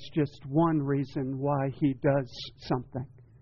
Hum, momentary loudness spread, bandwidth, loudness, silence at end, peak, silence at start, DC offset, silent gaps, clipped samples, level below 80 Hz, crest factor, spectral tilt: none; 14 LU; 6.8 kHz; -29 LUFS; 0.2 s; -14 dBFS; 0 s; under 0.1%; none; under 0.1%; -56 dBFS; 16 dB; -7 dB/octave